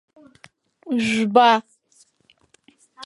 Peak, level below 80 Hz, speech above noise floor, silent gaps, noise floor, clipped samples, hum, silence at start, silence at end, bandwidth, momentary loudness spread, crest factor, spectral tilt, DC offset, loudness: -2 dBFS; -68 dBFS; 43 dB; none; -61 dBFS; under 0.1%; none; 0.85 s; 0 s; 11.5 kHz; 9 LU; 22 dB; -4.5 dB/octave; under 0.1%; -18 LUFS